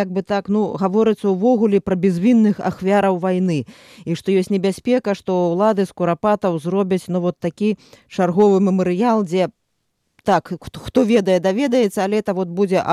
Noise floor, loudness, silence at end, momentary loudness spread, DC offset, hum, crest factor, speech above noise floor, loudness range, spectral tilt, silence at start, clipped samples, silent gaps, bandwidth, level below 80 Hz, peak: -70 dBFS; -18 LUFS; 0 s; 7 LU; under 0.1%; none; 12 dB; 53 dB; 2 LU; -7 dB/octave; 0 s; under 0.1%; none; 13 kHz; -54 dBFS; -4 dBFS